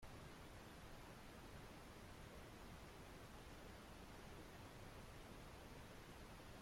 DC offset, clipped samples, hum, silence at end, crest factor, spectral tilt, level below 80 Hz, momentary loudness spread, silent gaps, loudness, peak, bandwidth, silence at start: under 0.1%; under 0.1%; none; 0 s; 12 dB; -4.5 dB/octave; -66 dBFS; 1 LU; none; -59 LUFS; -46 dBFS; 16.5 kHz; 0 s